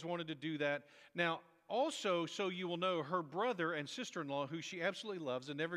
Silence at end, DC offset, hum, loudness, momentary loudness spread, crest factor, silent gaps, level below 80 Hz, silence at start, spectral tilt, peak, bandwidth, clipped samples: 0 s; under 0.1%; none; -40 LUFS; 6 LU; 20 dB; none; under -90 dBFS; 0 s; -4.5 dB/octave; -20 dBFS; 13 kHz; under 0.1%